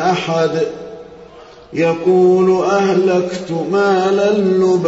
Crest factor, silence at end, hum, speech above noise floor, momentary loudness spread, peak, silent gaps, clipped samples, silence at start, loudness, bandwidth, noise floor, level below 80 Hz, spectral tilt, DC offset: 12 dB; 0 s; none; 25 dB; 11 LU; -2 dBFS; none; under 0.1%; 0 s; -14 LUFS; 8 kHz; -39 dBFS; -56 dBFS; -6.5 dB/octave; under 0.1%